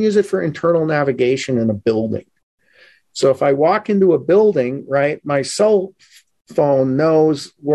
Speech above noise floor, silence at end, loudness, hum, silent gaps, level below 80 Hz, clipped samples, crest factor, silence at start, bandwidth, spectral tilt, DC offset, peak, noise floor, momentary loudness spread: 36 dB; 0 s; -16 LUFS; none; 2.43-2.58 s, 6.41-6.45 s; -56 dBFS; under 0.1%; 12 dB; 0 s; 12 kHz; -6 dB/octave; under 0.1%; -4 dBFS; -51 dBFS; 7 LU